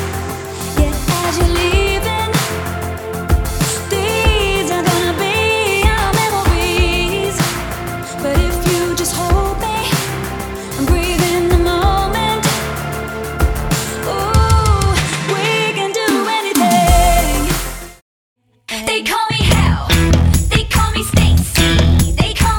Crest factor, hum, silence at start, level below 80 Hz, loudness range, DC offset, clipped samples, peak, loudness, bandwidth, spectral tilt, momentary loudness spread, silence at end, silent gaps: 14 dB; none; 0 s; -22 dBFS; 3 LU; under 0.1%; under 0.1%; 0 dBFS; -15 LUFS; over 20 kHz; -4.5 dB/octave; 9 LU; 0 s; 18.02-18.36 s